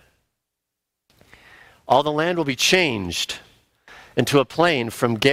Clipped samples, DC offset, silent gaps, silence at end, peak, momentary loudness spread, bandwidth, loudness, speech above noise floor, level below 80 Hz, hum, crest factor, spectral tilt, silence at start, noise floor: under 0.1%; under 0.1%; none; 0 s; -2 dBFS; 9 LU; 16 kHz; -20 LUFS; 62 dB; -58 dBFS; none; 20 dB; -4 dB/octave; 1.9 s; -82 dBFS